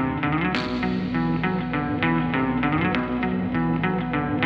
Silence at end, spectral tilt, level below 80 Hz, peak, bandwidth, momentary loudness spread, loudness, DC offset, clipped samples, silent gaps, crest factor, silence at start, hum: 0 s; -8 dB/octave; -42 dBFS; -4 dBFS; 7.2 kHz; 3 LU; -24 LUFS; under 0.1%; under 0.1%; none; 18 dB; 0 s; none